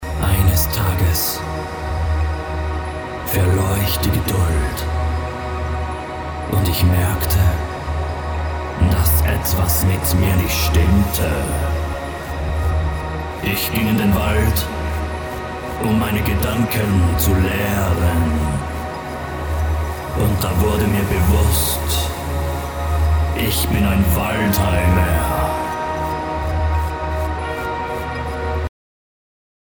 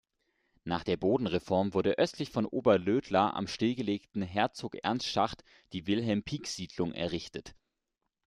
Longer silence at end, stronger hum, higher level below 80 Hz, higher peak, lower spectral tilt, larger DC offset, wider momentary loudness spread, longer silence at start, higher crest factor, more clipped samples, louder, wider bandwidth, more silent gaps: first, 0.95 s vs 0.75 s; neither; first, -24 dBFS vs -62 dBFS; first, -4 dBFS vs -12 dBFS; about the same, -5.5 dB/octave vs -5.5 dB/octave; neither; about the same, 9 LU vs 10 LU; second, 0 s vs 0.65 s; about the same, 16 dB vs 20 dB; neither; first, -19 LUFS vs -31 LUFS; first, over 20 kHz vs 12.5 kHz; neither